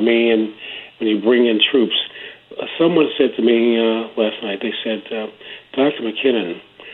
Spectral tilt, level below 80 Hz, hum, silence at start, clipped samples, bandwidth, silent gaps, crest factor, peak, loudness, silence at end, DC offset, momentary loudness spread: -8 dB/octave; -68 dBFS; none; 0 s; under 0.1%; 4.2 kHz; none; 18 dB; 0 dBFS; -18 LUFS; 0 s; under 0.1%; 16 LU